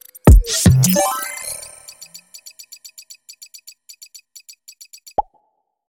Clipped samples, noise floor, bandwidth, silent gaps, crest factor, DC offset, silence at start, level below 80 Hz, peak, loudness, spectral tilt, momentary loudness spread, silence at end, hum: under 0.1%; -67 dBFS; 17 kHz; none; 18 dB; under 0.1%; 0.25 s; -24 dBFS; 0 dBFS; -16 LUFS; -5 dB/octave; 27 LU; 0.8 s; none